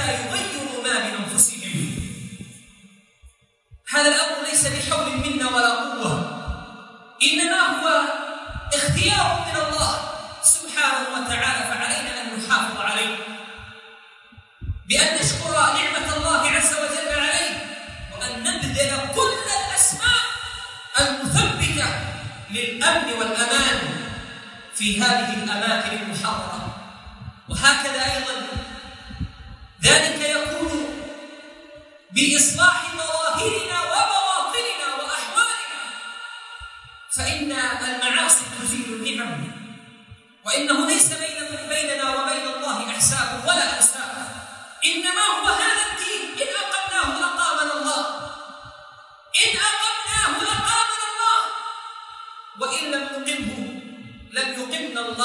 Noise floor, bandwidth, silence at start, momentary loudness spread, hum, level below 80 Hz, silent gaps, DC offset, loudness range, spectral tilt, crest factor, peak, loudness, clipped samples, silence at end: -53 dBFS; 11.5 kHz; 0 s; 18 LU; none; -46 dBFS; none; under 0.1%; 4 LU; -1.5 dB/octave; 22 dB; 0 dBFS; -20 LUFS; under 0.1%; 0 s